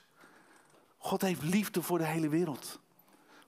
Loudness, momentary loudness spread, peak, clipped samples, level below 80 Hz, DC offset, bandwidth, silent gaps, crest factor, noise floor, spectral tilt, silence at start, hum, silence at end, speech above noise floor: -33 LUFS; 12 LU; -18 dBFS; under 0.1%; -76 dBFS; under 0.1%; 16 kHz; none; 18 dB; -63 dBFS; -5.5 dB/octave; 0.25 s; none; 0.7 s; 31 dB